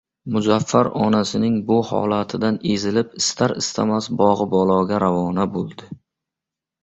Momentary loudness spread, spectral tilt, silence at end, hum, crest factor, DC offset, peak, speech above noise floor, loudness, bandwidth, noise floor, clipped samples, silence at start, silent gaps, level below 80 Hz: 5 LU; -5.5 dB/octave; 0.85 s; none; 18 dB; under 0.1%; -2 dBFS; 67 dB; -20 LUFS; 8.2 kHz; -86 dBFS; under 0.1%; 0.25 s; none; -52 dBFS